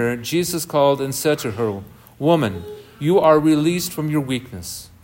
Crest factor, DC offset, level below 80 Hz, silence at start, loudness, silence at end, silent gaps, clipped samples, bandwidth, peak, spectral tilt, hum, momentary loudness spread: 16 dB; under 0.1%; -54 dBFS; 0 s; -19 LUFS; 0.15 s; none; under 0.1%; 16.5 kHz; -2 dBFS; -5.5 dB/octave; none; 16 LU